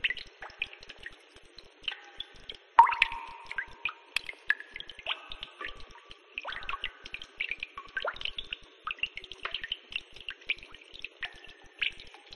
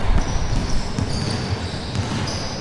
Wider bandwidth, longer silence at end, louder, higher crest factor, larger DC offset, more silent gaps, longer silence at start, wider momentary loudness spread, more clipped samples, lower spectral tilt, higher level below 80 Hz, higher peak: about the same, 11.5 kHz vs 11.5 kHz; about the same, 0 s vs 0 s; second, -34 LUFS vs -24 LUFS; first, 30 dB vs 16 dB; neither; neither; about the same, 0 s vs 0 s; first, 17 LU vs 2 LU; neither; second, -1 dB/octave vs -5 dB/octave; second, -58 dBFS vs -26 dBFS; about the same, -4 dBFS vs -4 dBFS